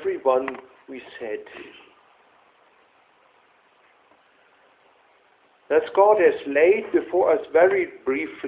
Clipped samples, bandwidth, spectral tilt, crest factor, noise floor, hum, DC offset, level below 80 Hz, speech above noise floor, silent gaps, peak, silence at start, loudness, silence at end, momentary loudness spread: under 0.1%; 4 kHz; -8.5 dB/octave; 20 dB; -59 dBFS; none; under 0.1%; -66 dBFS; 39 dB; none; -4 dBFS; 0 s; -21 LUFS; 0 s; 23 LU